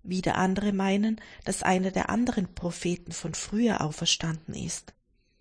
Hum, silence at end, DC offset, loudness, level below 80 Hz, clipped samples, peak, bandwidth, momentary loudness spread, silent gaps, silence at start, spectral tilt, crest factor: none; 0.5 s; under 0.1%; -28 LUFS; -50 dBFS; under 0.1%; -10 dBFS; 10.5 kHz; 9 LU; none; 0.05 s; -4.5 dB/octave; 18 dB